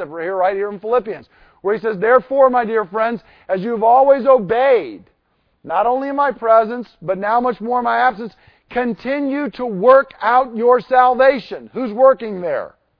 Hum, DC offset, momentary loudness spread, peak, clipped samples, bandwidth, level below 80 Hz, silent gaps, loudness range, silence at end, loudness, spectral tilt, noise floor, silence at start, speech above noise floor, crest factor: none; under 0.1%; 13 LU; 0 dBFS; under 0.1%; 5.2 kHz; -56 dBFS; none; 4 LU; 0.3 s; -16 LUFS; -8.5 dB/octave; -64 dBFS; 0 s; 48 dB; 16 dB